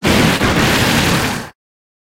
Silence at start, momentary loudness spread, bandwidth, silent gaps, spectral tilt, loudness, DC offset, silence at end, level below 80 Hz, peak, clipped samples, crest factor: 0 s; 11 LU; 17 kHz; none; -4 dB/octave; -13 LUFS; under 0.1%; 0.65 s; -30 dBFS; 0 dBFS; under 0.1%; 16 dB